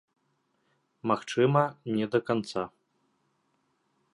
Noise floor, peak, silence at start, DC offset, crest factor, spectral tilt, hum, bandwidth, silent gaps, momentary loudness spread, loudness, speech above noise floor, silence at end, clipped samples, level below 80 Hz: -74 dBFS; -8 dBFS; 1.05 s; under 0.1%; 22 dB; -6.5 dB/octave; none; 11 kHz; none; 11 LU; -28 LUFS; 47 dB; 1.45 s; under 0.1%; -72 dBFS